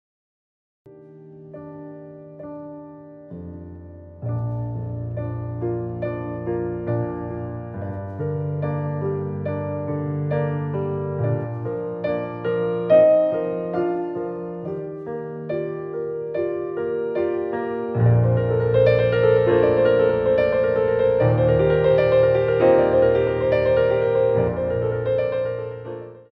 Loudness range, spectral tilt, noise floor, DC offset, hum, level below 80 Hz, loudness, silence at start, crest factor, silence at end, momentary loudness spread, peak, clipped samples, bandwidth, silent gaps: 14 LU; -10.5 dB/octave; -44 dBFS; under 0.1%; none; -46 dBFS; -21 LUFS; 0.85 s; 16 dB; 0.1 s; 20 LU; -4 dBFS; under 0.1%; 5.2 kHz; none